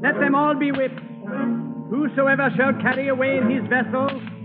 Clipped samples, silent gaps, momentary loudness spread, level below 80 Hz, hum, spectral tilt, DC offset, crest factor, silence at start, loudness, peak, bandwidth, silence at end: under 0.1%; none; 8 LU; -70 dBFS; none; -5 dB/octave; under 0.1%; 14 dB; 0 s; -21 LUFS; -6 dBFS; 4.6 kHz; 0 s